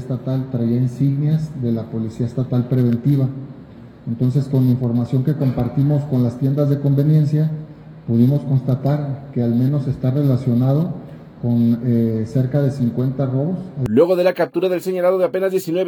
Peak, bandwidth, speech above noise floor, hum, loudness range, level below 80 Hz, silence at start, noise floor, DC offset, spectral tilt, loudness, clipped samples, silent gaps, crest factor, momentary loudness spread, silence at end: -2 dBFS; 18 kHz; 22 dB; none; 2 LU; -50 dBFS; 0 s; -39 dBFS; under 0.1%; -9.5 dB/octave; -19 LUFS; under 0.1%; none; 16 dB; 8 LU; 0 s